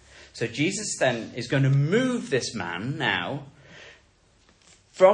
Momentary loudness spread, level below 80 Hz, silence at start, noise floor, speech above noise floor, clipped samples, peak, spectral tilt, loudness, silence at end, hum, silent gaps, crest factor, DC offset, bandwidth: 24 LU; -62 dBFS; 0.15 s; -60 dBFS; 35 dB; under 0.1%; -4 dBFS; -5 dB/octave; -25 LUFS; 0 s; none; none; 20 dB; under 0.1%; 10.5 kHz